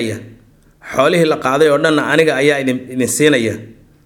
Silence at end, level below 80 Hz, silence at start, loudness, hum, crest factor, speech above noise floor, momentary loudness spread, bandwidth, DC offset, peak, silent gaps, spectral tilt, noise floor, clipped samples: 0.35 s; -54 dBFS; 0 s; -14 LUFS; none; 14 dB; 33 dB; 10 LU; 17 kHz; under 0.1%; 0 dBFS; none; -4.5 dB/octave; -47 dBFS; under 0.1%